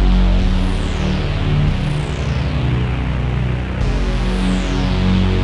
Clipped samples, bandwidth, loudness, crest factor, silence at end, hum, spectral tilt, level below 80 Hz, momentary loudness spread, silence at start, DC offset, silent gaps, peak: under 0.1%; 10.5 kHz; -19 LUFS; 12 dB; 0 s; none; -7 dB/octave; -18 dBFS; 4 LU; 0 s; under 0.1%; none; -4 dBFS